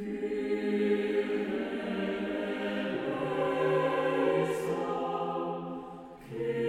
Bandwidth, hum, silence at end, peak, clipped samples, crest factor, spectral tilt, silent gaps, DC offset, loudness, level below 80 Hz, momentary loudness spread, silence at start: 14.5 kHz; none; 0 s; -16 dBFS; under 0.1%; 16 dB; -6.5 dB/octave; none; under 0.1%; -31 LUFS; -64 dBFS; 9 LU; 0 s